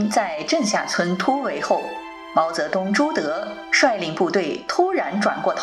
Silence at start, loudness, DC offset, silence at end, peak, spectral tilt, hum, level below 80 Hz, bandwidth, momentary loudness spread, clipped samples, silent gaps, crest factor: 0 s; -21 LUFS; under 0.1%; 0 s; -4 dBFS; -4 dB/octave; none; -64 dBFS; 14 kHz; 5 LU; under 0.1%; none; 18 dB